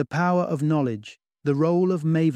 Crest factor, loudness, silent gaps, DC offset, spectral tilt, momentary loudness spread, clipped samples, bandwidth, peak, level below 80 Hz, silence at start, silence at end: 14 dB; -23 LUFS; none; under 0.1%; -8.5 dB/octave; 8 LU; under 0.1%; 9.2 kHz; -10 dBFS; -68 dBFS; 0 s; 0 s